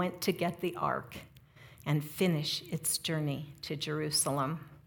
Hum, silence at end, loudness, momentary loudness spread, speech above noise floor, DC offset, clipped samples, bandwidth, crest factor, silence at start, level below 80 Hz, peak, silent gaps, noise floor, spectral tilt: none; 0.1 s; -33 LUFS; 10 LU; 23 dB; under 0.1%; under 0.1%; 18 kHz; 18 dB; 0 s; -68 dBFS; -16 dBFS; none; -56 dBFS; -4 dB/octave